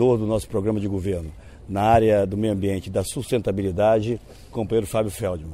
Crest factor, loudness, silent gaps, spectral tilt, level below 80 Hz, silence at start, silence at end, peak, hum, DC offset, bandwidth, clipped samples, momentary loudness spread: 18 dB; -23 LUFS; none; -6.5 dB/octave; -42 dBFS; 0 s; 0 s; -4 dBFS; none; under 0.1%; 16 kHz; under 0.1%; 12 LU